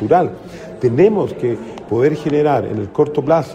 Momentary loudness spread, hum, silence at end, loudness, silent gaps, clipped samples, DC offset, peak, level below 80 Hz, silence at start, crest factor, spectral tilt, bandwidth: 9 LU; none; 0 s; -17 LUFS; none; under 0.1%; under 0.1%; -2 dBFS; -52 dBFS; 0 s; 14 dB; -8.5 dB/octave; 9.6 kHz